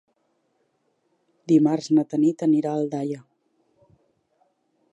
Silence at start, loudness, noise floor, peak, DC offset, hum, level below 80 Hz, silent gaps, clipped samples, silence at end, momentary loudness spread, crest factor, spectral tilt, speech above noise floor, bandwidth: 1.5 s; -22 LUFS; -70 dBFS; -6 dBFS; under 0.1%; none; -80 dBFS; none; under 0.1%; 1.75 s; 12 LU; 18 dB; -7.5 dB/octave; 49 dB; 8.2 kHz